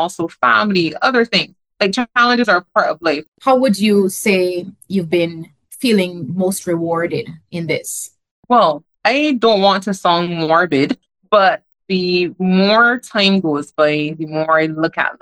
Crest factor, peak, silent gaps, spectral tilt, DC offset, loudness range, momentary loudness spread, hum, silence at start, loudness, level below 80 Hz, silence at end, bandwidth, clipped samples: 16 dB; 0 dBFS; 3.28-3.32 s, 8.31-8.43 s; -4.5 dB/octave; under 0.1%; 4 LU; 9 LU; none; 0 s; -15 LUFS; -62 dBFS; 0.05 s; over 20 kHz; under 0.1%